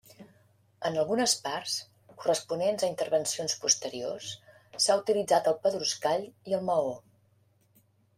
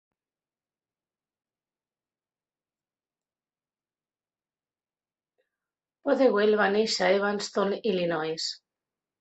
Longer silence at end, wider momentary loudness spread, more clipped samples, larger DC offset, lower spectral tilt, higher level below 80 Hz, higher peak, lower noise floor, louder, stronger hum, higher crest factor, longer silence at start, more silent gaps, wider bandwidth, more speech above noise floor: first, 1.2 s vs 0.65 s; about the same, 10 LU vs 10 LU; neither; neither; second, -2 dB/octave vs -4 dB/octave; about the same, -74 dBFS vs -76 dBFS; about the same, -10 dBFS vs -10 dBFS; second, -67 dBFS vs under -90 dBFS; second, -29 LUFS vs -26 LUFS; neither; about the same, 20 dB vs 20 dB; second, 0.2 s vs 6.05 s; neither; first, 16 kHz vs 8.4 kHz; second, 38 dB vs over 65 dB